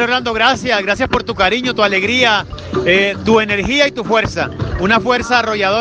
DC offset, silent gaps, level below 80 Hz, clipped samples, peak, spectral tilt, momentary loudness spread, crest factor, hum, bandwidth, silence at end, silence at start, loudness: under 0.1%; none; -36 dBFS; under 0.1%; 0 dBFS; -4.5 dB/octave; 6 LU; 14 dB; none; 9.8 kHz; 0 s; 0 s; -14 LUFS